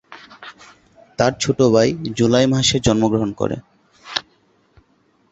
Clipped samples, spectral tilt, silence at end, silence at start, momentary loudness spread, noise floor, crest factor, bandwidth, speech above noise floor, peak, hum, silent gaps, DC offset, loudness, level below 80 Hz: under 0.1%; -5 dB/octave; 1.1 s; 0.1 s; 23 LU; -60 dBFS; 18 dB; 8.2 kHz; 43 dB; -2 dBFS; none; none; under 0.1%; -18 LUFS; -44 dBFS